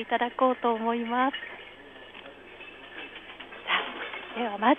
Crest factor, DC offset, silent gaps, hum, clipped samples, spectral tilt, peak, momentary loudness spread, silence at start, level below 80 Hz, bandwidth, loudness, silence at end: 22 dB; under 0.1%; none; 50 Hz at -65 dBFS; under 0.1%; -6 dB/octave; -8 dBFS; 20 LU; 0 s; -68 dBFS; 4.1 kHz; -28 LUFS; 0 s